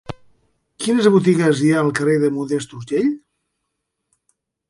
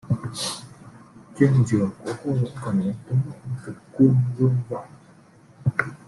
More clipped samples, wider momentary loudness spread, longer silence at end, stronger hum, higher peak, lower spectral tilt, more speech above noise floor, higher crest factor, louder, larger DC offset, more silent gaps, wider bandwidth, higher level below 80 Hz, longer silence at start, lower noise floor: neither; about the same, 13 LU vs 15 LU; first, 1.5 s vs 0.1 s; neither; about the same, -2 dBFS vs -4 dBFS; about the same, -6 dB/octave vs -7 dB/octave; first, 60 dB vs 30 dB; about the same, 18 dB vs 20 dB; first, -18 LUFS vs -23 LUFS; neither; neither; about the same, 11.5 kHz vs 12 kHz; about the same, -58 dBFS vs -56 dBFS; about the same, 0.1 s vs 0.05 s; first, -76 dBFS vs -51 dBFS